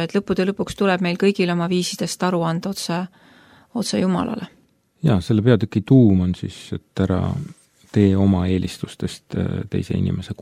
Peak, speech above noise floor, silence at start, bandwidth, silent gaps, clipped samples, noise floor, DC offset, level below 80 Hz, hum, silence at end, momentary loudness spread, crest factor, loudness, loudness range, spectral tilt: -2 dBFS; 31 dB; 0 s; 14.5 kHz; none; under 0.1%; -50 dBFS; under 0.1%; -48 dBFS; none; 0 s; 13 LU; 18 dB; -20 LUFS; 4 LU; -6.5 dB/octave